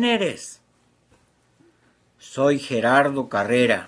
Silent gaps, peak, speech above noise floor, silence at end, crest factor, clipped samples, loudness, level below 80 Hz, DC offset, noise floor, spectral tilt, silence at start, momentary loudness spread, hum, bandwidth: none; -6 dBFS; 42 dB; 0 s; 18 dB; under 0.1%; -21 LUFS; -66 dBFS; under 0.1%; -62 dBFS; -4.5 dB/octave; 0 s; 18 LU; none; 11 kHz